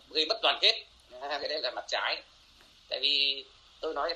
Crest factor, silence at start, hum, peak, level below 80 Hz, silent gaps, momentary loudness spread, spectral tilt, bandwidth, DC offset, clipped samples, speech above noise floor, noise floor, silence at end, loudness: 22 dB; 0.1 s; none; -10 dBFS; -66 dBFS; none; 13 LU; 0 dB/octave; 11.5 kHz; under 0.1%; under 0.1%; 28 dB; -59 dBFS; 0 s; -29 LUFS